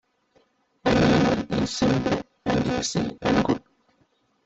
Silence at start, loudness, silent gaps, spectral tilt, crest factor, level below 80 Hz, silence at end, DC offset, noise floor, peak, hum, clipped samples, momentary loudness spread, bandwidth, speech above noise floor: 0.85 s; -23 LUFS; none; -5.5 dB/octave; 18 dB; -46 dBFS; 0.85 s; under 0.1%; -66 dBFS; -6 dBFS; none; under 0.1%; 8 LU; 8.2 kHz; 43 dB